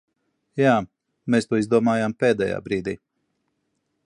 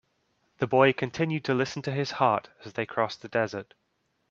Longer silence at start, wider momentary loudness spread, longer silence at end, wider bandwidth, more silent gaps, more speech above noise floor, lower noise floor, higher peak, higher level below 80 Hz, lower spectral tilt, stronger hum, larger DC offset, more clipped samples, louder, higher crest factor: about the same, 0.55 s vs 0.6 s; first, 15 LU vs 11 LU; first, 1.1 s vs 0.65 s; first, 11 kHz vs 7.6 kHz; neither; first, 53 dB vs 45 dB; about the same, -74 dBFS vs -72 dBFS; about the same, -4 dBFS vs -6 dBFS; first, -58 dBFS vs -68 dBFS; about the same, -6.5 dB/octave vs -6 dB/octave; neither; neither; neither; first, -22 LUFS vs -27 LUFS; about the same, 20 dB vs 24 dB